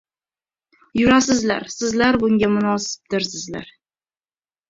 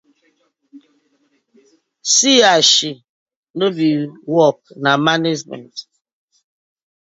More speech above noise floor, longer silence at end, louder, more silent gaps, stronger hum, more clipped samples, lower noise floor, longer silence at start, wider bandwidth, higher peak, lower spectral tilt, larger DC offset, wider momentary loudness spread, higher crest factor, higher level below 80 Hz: first, over 71 dB vs 48 dB; second, 1.05 s vs 1.2 s; second, -19 LUFS vs -14 LUFS; second, none vs 3.09-3.26 s, 3.36-3.43 s, 3.50-3.54 s; neither; neither; first, under -90 dBFS vs -63 dBFS; first, 0.95 s vs 0.75 s; about the same, 7.8 kHz vs 8 kHz; about the same, -2 dBFS vs 0 dBFS; first, -4 dB/octave vs -2.5 dB/octave; neither; second, 12 LU vs 21 LU; about the same, 20 dB vs 18 dB; first, -50 dBFS vs -68 dBFS